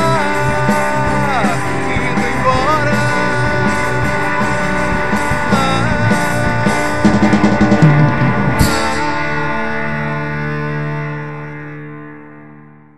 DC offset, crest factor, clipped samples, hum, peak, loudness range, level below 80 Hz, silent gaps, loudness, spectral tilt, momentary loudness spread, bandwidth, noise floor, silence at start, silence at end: 8%; 14 dB; under 0.1%; none; 0 dBFS; 7 LU; -32 dBFS; none; -15 LUFS; -6 dB/octave; 10 LU; 13.5 kHz; -39 dBFS; 0 s; 0 s